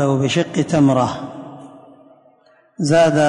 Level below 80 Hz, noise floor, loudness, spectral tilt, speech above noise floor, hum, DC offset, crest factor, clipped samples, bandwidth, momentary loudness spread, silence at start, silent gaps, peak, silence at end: -54 dBFS; -54 dBFS; -17 LUFS; -6 dB/octave; 39 dB; none; under 0.1%; 14 dB; under 0.1%; 11 kHz; 21 LU; 0 s; none; -4 dBFS; 0 s